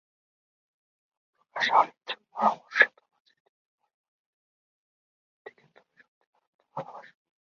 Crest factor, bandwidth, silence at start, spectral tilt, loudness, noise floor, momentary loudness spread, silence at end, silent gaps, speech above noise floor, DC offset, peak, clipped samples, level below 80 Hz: 28 dB; 7.2 kHz; 1.55 s; 0.5 dB/octave; -25 LUFS; -62 dBFS; 20 LU; 0.55 s; 3.20-3.25 s, 3.40-3.78 s, 3.94-5.45 s, 6.08-6.33 s, 6.47-6.59 s; 38 dB; under 0.1%; -4 dBFS; under 0.1%; -88 dBFS